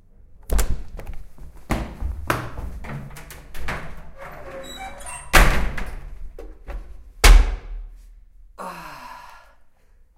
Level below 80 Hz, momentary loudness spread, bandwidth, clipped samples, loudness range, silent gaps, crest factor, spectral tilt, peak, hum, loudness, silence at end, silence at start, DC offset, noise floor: -24 dBFS; 25 LU; 16.5 kHz; under 0.1%; 10 LU; none; 22 dB; -3.5 dB/octave; 0 dBFS; none; -23 LUFS; 0.8 s; 0.35 s; under 0.1%; -52 dBFS